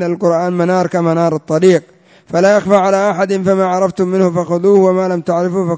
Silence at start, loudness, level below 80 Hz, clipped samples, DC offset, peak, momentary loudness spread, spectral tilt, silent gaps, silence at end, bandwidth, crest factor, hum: 0 s; -13 LUFS; -56 dBFS; under 0.1%; under 0.1%; 0 dBFS; 5 LU; -7 dB/octave; none; 0 s; 8 kHz; 12 dB; none